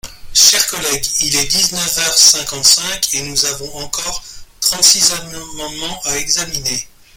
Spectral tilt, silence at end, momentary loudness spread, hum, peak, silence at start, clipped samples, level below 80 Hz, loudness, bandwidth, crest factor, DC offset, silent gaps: 0.5 dB/octave; 0.3 s; 15 LU; none; 0 dBFS; 0.05 s; 0.1%; -40 dBFS; -12 LUFS; over 20 kHz; 16 dB; under 0.1%; none